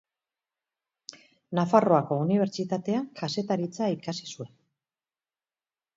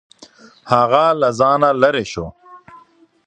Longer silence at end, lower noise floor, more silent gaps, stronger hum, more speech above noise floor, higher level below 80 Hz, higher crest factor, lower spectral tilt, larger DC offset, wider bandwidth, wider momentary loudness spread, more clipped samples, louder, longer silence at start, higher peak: first, 1.5 s vs 0.5 s; first, under -90 dBFS vs -49 dBFS; neither; neither; first, over 64 dB vs 35 dB; second, -74 dBFS vs -50 dBFS; about the same, 22 dB vs 18 dB; about the same, -6.5 dB/octave vs -5.5 dB/octave; neither; second, 7.8 kHz vs 9.4 kHz; first, 22 LU vs 14 LU; neither; second, -27 LUFS vs -15 LUFS; first, 1.5 s vs 0.65 s; second, -6 dBFS vs 0 dBFS